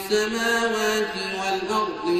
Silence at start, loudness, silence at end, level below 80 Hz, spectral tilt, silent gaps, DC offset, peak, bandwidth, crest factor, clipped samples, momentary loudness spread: 0 s; -23 LUFS; 0 s; -58 dBFS; -3 dB/octave; none; under 0.1%; -10 dBFS; 15 kHz; 14 dB; under 0.1%; 4 LU